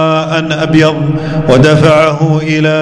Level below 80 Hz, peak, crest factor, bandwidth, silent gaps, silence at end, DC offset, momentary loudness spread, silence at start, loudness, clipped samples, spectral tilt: -36 dBFS; 0 dBFS; 8 dB; 10.5 kHz; none; 0 s; under 0.1%; 7 LU; 0 s; -9 LUFS; 2%; -6.5 dB/octave